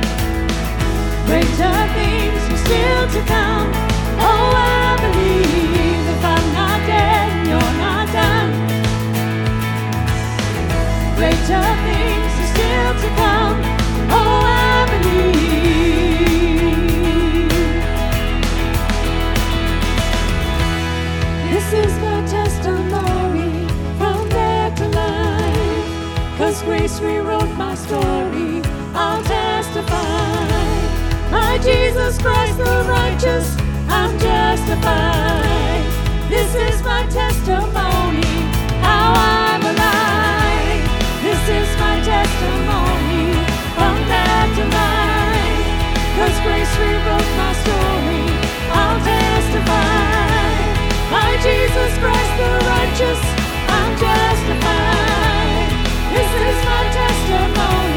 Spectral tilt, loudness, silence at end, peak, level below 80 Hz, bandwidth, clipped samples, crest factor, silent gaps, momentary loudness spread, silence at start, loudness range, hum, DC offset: -5 dB/octave; -16 LUFS; 0 s; 0 dBFS; -22 dBFS; 19 kHz; under 0.1%; 14 dB; none; 5 LU; 0 s; 4 LU; none; under 0.1%